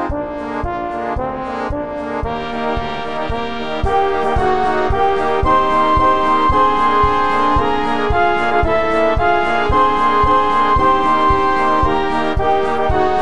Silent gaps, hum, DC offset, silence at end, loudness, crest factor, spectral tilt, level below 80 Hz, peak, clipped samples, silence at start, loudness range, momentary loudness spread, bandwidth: none; none; 6%; 0 s; -16 LUFS; 14 dB; -6.5 dB/octave; -28 dBFS; -2 dBFS; under 0.1%; 0 s; 7 LU; 9 LU; 10.5 kHz